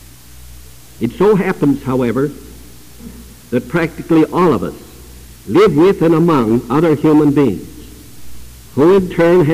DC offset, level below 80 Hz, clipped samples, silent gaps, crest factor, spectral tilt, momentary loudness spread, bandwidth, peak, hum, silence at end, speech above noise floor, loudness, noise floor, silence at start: 0.7%; -40 dBFS; under 0.1%; none; 10 dB; -7.5 dB/octave; 15 LU; 16 kHz; -4 dBFS; none; 0 s; 26 dB; -13 LUFS; -38 dBFS; 0.5 s